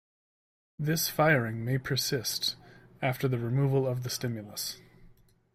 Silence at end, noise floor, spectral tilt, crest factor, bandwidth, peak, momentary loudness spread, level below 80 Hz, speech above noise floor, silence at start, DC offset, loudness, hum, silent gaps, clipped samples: 0.4 s; -59 dBFS; -4.5 dB/octave; 20 dB; 16 kHz; -12 dBFS; 11 LU; -62 dBFS; 29 dB; 0.8 s; under 0.1%; -30 LUFS; none; none; under 0.1%